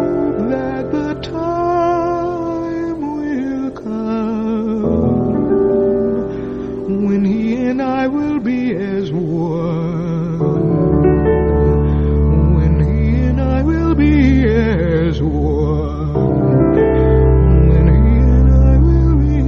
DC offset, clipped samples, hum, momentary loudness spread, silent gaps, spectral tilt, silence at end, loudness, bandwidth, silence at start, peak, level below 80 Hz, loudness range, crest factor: under 0.1%; under 0.1%; none; 9 LU; none; -10 dB/octave; 0 s; -15 LUFS; 6.4 kHz; 0 s; 0 dBFS; -20 dBFS; 6 LU; 14 dB